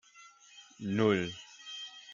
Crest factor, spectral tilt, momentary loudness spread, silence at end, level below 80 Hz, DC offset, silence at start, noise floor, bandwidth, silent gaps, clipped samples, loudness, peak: 20 dB; -5.5 dB/octave; 25 LU; 0 s; -74 dBFS; under 0.1%; 0.15 s; -58 dBFS; 7.6 kHz; none; under 0.1%; -33 LUFS; -14 dBFS